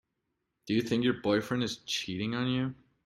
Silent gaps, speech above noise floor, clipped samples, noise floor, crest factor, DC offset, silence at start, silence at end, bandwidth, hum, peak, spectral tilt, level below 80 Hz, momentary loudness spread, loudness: none; 52 dB; under 0.1%; -82 dBFS; 18 dB; under 0.1%; 0.65 s; 0.3 s; 14 kHz; none; -14 dBFS; -5 dB/octave; -64 dBFS; 5 LU; -31 LUFS